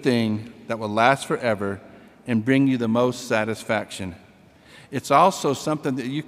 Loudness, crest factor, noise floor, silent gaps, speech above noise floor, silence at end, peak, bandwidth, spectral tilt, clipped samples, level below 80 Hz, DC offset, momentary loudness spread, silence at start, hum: -22 LUFS; 20 dB; -51 dBFS; none; 29 dB; 0 s; -2 dBFS; 16 kHz; -5.5 dB/octave; under 0.1%; -64 dBFS; under 0.1%; 14 LU; 0 s; none